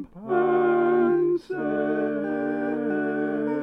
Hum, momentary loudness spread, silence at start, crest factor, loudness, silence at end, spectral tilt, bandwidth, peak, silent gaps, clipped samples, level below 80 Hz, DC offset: none; 6 LU; 0 s; 12 dB; -24 LUFS; 0 s; -9 dB/octave; 5.4 kHz; -12 dBFS; none; under 0.1%; -62 dBFS; under 0.1%